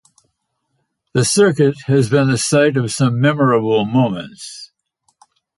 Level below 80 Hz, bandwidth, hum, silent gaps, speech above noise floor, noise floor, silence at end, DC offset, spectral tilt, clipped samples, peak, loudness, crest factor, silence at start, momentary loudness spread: -54 dBFS; 11.5 kHz; none; none; 55 dB; -70 dBFS; 0.9 s; under 0.1%; -5.5 dB/octave; under 0.1%; -2 dBFS; -15 LUFS; 14 dB; 1.15 s; 15 LU